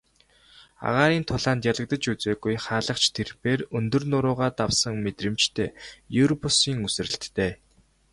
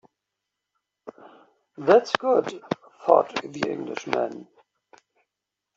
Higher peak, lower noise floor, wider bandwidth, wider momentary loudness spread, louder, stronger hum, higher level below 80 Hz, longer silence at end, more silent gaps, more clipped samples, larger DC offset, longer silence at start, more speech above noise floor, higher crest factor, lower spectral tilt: second, -6 dBFS vs -2 dBFS; second, -59 dBFS vs -85 dBFS; first, 11.5 kHz vs 7.8 kHz; second, 8 LU vs 14 LU; about the same, -25 LUFS vs -24 LUFS; neither; first, -50 dBFS vs -72 dBFS; second, 0.6 s vs 1.35 s; neither; neither; neither; second, 0.8 s vs 1.05 s; second, 34 dB vs 62 dB; about the same, 20 dB vs 24 dB; about the same, -4 dB/octave vs -5 dB/octave